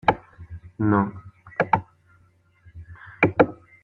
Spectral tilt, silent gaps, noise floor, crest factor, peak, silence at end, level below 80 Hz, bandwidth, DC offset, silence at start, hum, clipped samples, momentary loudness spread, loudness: -9 dB/octave; none; -60 dBFS; 24 dB; -2 dBFS; 0.3 s; -52 dBFS; 7 kHz; under 0.1%; 0.05 s; none; under 0.1%; 23 LU; -23 LUFS